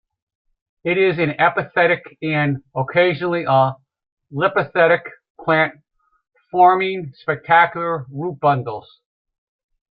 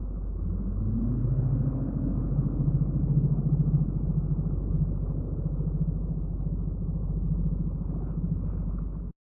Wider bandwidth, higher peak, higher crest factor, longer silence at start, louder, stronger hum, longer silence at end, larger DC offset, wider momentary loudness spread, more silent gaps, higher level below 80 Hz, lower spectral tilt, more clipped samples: first, 5.2 kHz vs 1.6 kHz; first, -2 dBFS vs -14 dBFS; about the same, 18 dB vs 14 dB; first, 0.85 s vs 0 s; first, -18 LUFS vs -29 LUFS; neither; first, 1.1 s vs 0.2 s; neither; first, 12 LU vs 7 LU; first, 4.12-4.17 s, 5.30-5.35 s vs none; second, -62 dBFS vs -32 dBFS; second, -11 dB/octave vs -16 dB/octave; neither